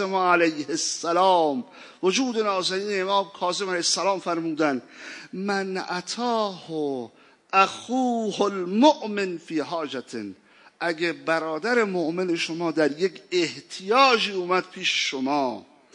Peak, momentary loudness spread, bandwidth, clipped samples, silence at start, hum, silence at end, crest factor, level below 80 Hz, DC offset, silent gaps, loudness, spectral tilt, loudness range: -4 dBFS; 12 LU; 11 kHz; under 0.1%; 0 s; none; 0.35 s; 22 dB; -82 dBFS; under 0.1%; none; -24 LUFS; -3.5 dB/octave; 4 LU